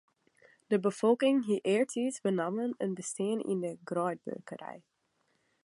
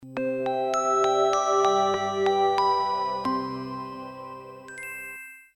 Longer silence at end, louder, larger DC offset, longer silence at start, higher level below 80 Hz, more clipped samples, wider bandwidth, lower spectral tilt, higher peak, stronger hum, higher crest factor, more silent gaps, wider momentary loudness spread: first, 0.85 s vs 0.15 s; second, -31 LUFS vs -25 LUFS; neither; first, 0.7 s vs 0 s; second, -84 dBFS vs -66 dBFS; neither; second, 11.5 kHz vs 16.5 kHz; first, -5.5 dB/octave vs -3.5 dB/octave; second, -14 dBFS vs -10 dBFS; neither; about the same, 18 dB vs 16 dB; neither; about the same, 15 LU vs 17 LU